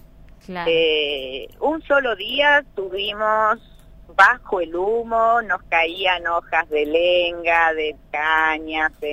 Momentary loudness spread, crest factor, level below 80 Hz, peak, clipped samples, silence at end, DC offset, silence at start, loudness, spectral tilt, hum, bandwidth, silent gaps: 10 LU; 20 dB; -48 dBFS; 0 dBFS; under 0.1%; 0 s; under 0.1%; 0.5 s; -19 LUFS; -4 dB/octave; none; 15 kHz; none